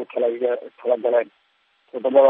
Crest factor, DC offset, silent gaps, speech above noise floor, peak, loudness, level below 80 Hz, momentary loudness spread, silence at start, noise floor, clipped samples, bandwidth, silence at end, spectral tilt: 18 dB; under 0.1%; none; 44 dB; -2 dBFS; -22 LUFS; -88 dBFS; 11 LU; 0 s; -64 dBFS; under 0.1%; 3.8 kHz; 0 s; -8 dB/octave